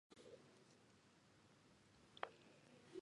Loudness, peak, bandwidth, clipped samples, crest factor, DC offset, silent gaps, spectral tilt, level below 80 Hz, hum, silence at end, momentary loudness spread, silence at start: -60 LUFS; -26 dBFS; 11 kHz; under 0.1%; 36 dB; under 0.1%; none; -4 dB/octave; -90 dBFS; none; 0 s; 13 LU; 0.1 s